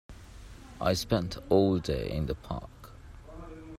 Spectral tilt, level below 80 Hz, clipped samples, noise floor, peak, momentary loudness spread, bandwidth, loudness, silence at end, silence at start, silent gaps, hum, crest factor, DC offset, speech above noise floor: -6 dB/octave; -46 dBFS; under 0.1%; -48 dBFS; -10 dBFS; 24 LU; 16 kHz; -30 LUFS; 0 s; 0.1 s; none; none; 22 dB; under 0.1%; 20 dB